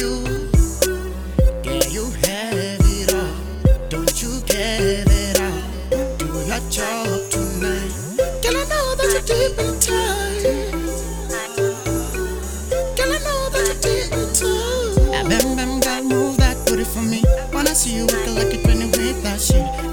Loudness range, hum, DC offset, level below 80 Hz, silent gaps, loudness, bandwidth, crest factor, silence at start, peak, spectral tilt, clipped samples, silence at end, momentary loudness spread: 3 LU; none; under 0.1%; -24 dBFS; none; -20 LUFS; over 20 kHz; 18 dB; 0 s; 0 dBFS; -4 dB/octave; under 0.1%; 0 s; 7 LU